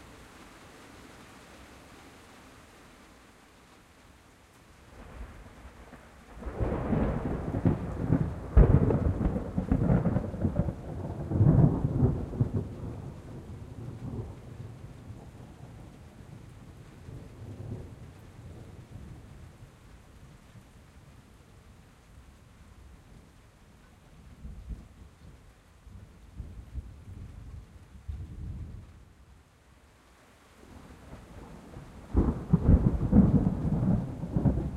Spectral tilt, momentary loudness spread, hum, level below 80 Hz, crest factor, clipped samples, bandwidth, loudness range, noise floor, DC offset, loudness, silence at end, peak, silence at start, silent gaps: -9.5 dB/octave; 27 LU; none; -38 dBFS; 24 dB; under 0.1%; 11 kHz; 24 LU; -59 dBFS; under 0.1%; -29 LUFS; 0 s; -8 dBFS; 0 s; none